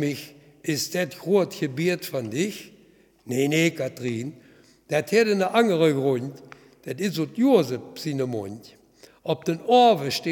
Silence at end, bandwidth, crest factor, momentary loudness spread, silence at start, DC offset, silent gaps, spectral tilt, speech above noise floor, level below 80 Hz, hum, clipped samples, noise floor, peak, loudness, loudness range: 0 s; 19 kHz; 20 dB; 16 LU; 0 s; under 0.1%; none; -5 dB/octave; 33 dB; -72 dBFS; none; under 0.1%; -57 dBFS; -4 dBFS; -24 LUFS; 4 LU